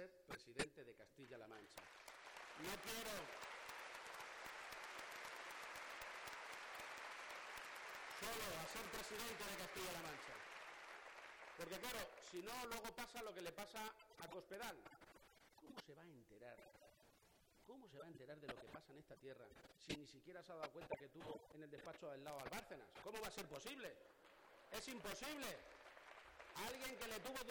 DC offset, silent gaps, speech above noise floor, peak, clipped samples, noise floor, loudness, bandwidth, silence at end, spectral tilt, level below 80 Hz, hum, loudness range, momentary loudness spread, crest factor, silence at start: under 0.1%; none; 21 dB; -28 dBFS; under 0.1%; -74 dBFS; -53 LUFS; over 20 kHz; 0 s; -2.5 dB/octave; -76 dBFS; none; 10 LU; 13 LU; 26 dB; 0 s